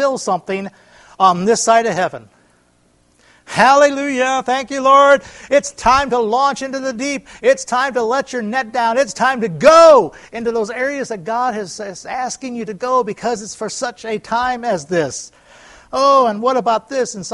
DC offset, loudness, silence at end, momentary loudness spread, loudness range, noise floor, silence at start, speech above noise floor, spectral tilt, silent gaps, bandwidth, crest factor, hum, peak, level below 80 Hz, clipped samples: under 0.1%; -15 LUFS; 0 s; 14 LU; 8 LU; -56 dBFS; 0 s; 41 dB; -3.5 dB/octave; none; 11.5 kHz; 16 dB; none; 0 dBFS; -50 dBFS; under 0.1%